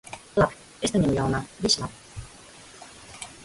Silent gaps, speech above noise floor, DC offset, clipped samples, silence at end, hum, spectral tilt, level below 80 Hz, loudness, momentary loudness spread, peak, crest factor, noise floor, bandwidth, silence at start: none; 23 dB; under 0.1%; under 0.1%; 0 s; none; -4.5 dB/octave; -46 dBFS; -25 LUFS; 21 LU; -8 dBFS; 20 dB; -48 dBFS; 11.5 kHz; 0.05 s